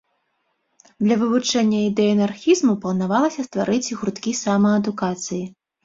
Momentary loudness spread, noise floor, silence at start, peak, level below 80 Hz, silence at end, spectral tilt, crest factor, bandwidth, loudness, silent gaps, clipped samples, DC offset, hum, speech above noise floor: 8 LU; -71 dBFS; 1 s; -6 dBFS; -60 dBFS; 0.35 s; -5 dB/octave; 16 dB; 7.8 kHz; -20 LUFS; none; under 0.1%; under 0.1%; none; 51 dB